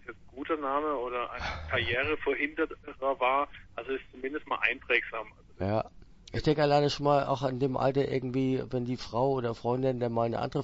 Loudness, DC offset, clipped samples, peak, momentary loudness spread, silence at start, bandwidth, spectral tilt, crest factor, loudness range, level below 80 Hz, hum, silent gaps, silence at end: -30 LUFS; under 0.1%; under 0.1%; -10 dBFS; 11 LU; 0.05 s; 8 kHz; -6.5 dB/octave; 22 dB; 3 LU; -52 dBFS; none; none; 0 s